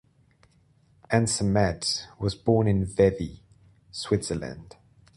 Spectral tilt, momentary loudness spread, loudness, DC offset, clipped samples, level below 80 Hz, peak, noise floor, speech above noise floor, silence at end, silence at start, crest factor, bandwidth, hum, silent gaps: -5.5 dB/octave; 14 LU; -26 LUFS; under 0.1%; under 0.1%; -46 dBFS; -6 dBFS; -62 dBFS; 37 dB; 0.55 s; 1.1 s; 20 dB; 11.5 kHz; none; none